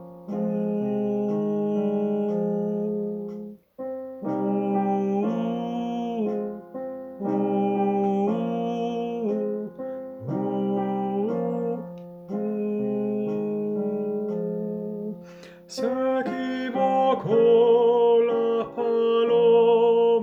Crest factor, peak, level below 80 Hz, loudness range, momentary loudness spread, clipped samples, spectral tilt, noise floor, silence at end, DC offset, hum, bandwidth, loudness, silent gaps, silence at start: 16 dB; -10 dBFS; -68 dBFS; 7 LU; 15 LU; under 0.1%; -8 dB/octave; -45 dBFS; 0 s; under 0.1%; none; 7.8 kHz; -25 LUFS; none; 0 s